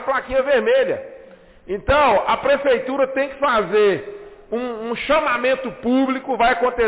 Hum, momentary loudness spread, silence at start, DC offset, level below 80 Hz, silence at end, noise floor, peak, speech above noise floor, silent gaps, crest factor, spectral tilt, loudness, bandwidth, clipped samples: none; 11 LU; 0 s; under 0.1%; -42 dBFS; 0 s; -44 dBFS; -8 dBFS; 26 dB; none; 10 dB; -8.5 dB/octave; -19 LUFS; 4 kHz; under 0.1%